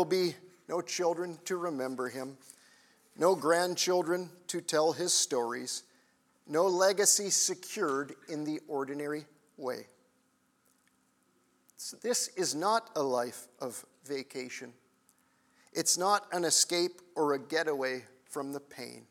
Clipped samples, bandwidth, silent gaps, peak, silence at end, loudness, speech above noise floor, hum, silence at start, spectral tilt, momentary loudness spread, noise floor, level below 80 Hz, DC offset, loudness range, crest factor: under 0.1%; 18 kHz; none; -12 dBFS; 0.1 s; -31 LUFS; 40 dB; none; 0 s; -2 dB/octave; 16 LU; -72 dBFS; under -90 dBFS; under 0.1%; 9 LU; 20 dB